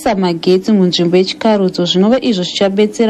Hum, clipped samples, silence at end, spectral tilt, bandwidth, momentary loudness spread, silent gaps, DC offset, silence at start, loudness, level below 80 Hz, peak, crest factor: none; under 0.1%; 0 s; -6 dB/octave; 12 kHz; 3 LU; none; under 0.1%; 0 s; -12 LUFS; -48 dBFS; -2 dBFS; 10 dB